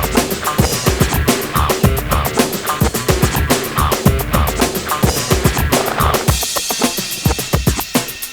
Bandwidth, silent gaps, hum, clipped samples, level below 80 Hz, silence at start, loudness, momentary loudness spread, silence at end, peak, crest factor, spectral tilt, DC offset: over 20 kHz; none; none; under 0.1%; -24 dBFS; 0 s; -15 LUFS; 3 LU; 0 s; 0 dBFS; 16 dB; -4 dB/octave; under 0.1%